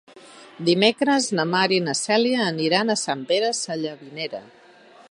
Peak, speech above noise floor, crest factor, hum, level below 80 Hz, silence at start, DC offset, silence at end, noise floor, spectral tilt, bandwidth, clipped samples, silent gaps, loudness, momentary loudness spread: -2 dBFS; 28 dB; 20 dB; none; -76 dBFS; 0.15 s; under 0.1%; 0.6 s; -50 dBFS; -3.5 dB/octave; 11 kHz; under 0.1%; none; -22 LUFS; 13 LU